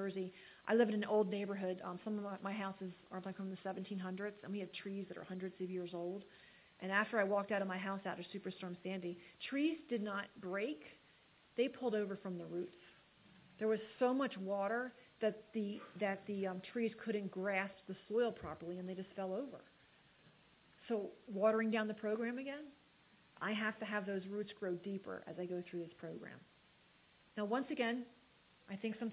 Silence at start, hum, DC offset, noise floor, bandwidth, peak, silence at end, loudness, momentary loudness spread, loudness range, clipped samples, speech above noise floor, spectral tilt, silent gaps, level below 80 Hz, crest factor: 0 s; none; under 0.1%; -70 dBFS; 4 kHz; -22 dBFS; 0 s; -41 LUFS; 13 LU; 5 LU; under 0.1%; 29 dB; -4.5 dB/octave; none; -80 dBFS; 20 dB